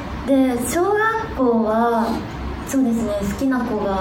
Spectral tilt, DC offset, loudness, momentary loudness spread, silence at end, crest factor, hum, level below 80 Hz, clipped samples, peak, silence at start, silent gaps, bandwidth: -5.5 dB/octave; under 0.1%; -20 LUFS; 6 LU; 0 s; 14 dB; none; -36 dBFS; under 0.1%; -6 dBFS; 0 s; none; 19.5 kHz